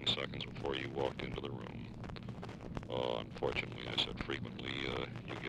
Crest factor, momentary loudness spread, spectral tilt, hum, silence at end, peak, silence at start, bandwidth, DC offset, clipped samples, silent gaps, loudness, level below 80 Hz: 20 dB; 11 LU; -5 dB/octave; none; 0 s; -20 dBFS; 0 s; 11.5 kHz; under 0.1%; under 0.1%; none; -40 LUFS; -56 dBFS